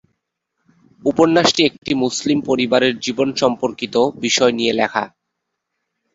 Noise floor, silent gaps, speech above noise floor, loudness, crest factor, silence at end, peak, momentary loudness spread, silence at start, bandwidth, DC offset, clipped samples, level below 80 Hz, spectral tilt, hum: -77 dBFS; 1.78-1.82 s; 60 dB; -17 LUFS; 18 dB; 1.1 s; -2 dBFS; 7 LU; 1.05 s; 8 kHz; under 0.1%; under 0.1%; -56 dBFS; -3.5 dB/octave; none